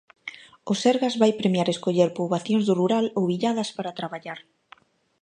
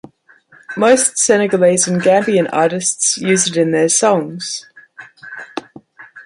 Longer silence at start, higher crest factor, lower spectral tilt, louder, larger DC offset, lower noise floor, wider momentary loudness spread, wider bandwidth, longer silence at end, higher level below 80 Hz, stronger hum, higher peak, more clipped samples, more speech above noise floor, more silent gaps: second, 0.25 s vs 0.7 s; about the same, 20 dB vs 16 dB; first, -6 dB/octave vs -3.5 dB/octave; second, -24 LUFS vs -14 LUFS; neither; first, -55 dBFS vs -49 dBFS; about the same, 18 LU vs 17 LU; second, 10 kHz vs 11.5 kHz; first, 0.85 s vs 0.05 s; second, -72 dBFS vs -62 dBFS; neither; second, -6 dBFS vs 0 dBFS; neither; about the same, 32 dB vs 35 dB; neither